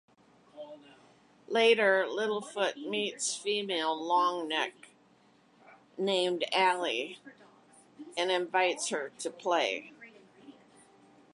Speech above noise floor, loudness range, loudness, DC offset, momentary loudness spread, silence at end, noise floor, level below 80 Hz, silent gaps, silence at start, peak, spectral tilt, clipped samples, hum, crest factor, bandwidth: 34 dB; 4 LU; -30 LUFS; under 0.1%; 18 LU; 0.8 s; -64 dBFS; -88 dBFS; none; 0.55 s; -12 dBFS; -2 dB/octave; under 0.1%; none; 20 dB; 11.5 kHz